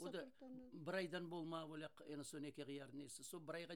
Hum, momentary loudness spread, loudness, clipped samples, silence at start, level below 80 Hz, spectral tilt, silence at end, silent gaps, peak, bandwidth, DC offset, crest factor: none; 8 LU; -51 LUFS; under 0.1%; 0 s; -88 dBFS; -4.5 dB/octave; 0 s; none; -34 dBFS; 18 kHz; under 0.1%; 18 dB